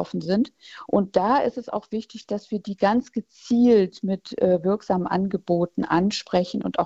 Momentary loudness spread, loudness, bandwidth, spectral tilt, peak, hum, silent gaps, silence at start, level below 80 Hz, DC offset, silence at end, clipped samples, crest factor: 11 LU; -23 LUFS; 8 kHz; -7 dB/octave; -6 dBFS; none; none; 0 s; -58 dBFS; under 0.1%; 0 s; under 0.1%; 18 dB